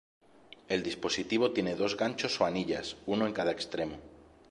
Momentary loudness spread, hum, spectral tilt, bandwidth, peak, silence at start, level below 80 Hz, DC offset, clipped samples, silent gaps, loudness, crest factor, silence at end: 7 LU; none; -4.5 dB/octave; 11.5 kHz; -14 dBFS; 0.7 s; -62 dBFS; under 0.1%; under 0.1%; none; -32 LUFS; 20 dB; 0.25 s